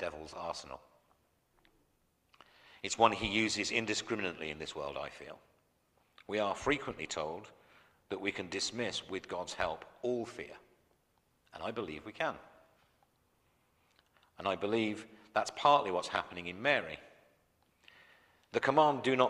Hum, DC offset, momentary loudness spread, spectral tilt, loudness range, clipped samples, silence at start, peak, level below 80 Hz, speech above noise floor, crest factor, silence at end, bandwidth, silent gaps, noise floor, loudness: none; under 0.1%; 17 LU; -3.5 dB/octave; 9 LU; under 0.1%; 0 s; -10 dBFS; -66 dBFS; 40 dB; 26 dB; 0 s; 14 kHz; none; -75 dBFS; -35 LUFS